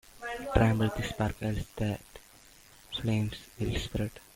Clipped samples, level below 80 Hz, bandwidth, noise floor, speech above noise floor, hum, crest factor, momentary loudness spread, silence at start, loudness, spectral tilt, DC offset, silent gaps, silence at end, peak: under 0.1%; -44 dBFS; 16.5 kHz; -56 dBFS; 26 dB; none; 24 dB; 13 LU; 0.15 s; -32 LUFS; -6.5 dB/octave; under 0.1%; none; 0.15 s; -8 dBFS